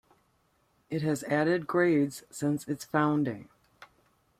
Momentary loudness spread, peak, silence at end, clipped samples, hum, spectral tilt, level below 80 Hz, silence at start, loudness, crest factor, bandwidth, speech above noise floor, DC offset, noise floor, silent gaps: 8 LU; -12 dBFS; 0.55 s; under 0.1%; none; -6.5 dB/octave; -70 dBFS; 0.9 s; -29 LUFS; 20 dB; 15.5 kHz; 42 dB; under 0.1%; -70 dBFS; none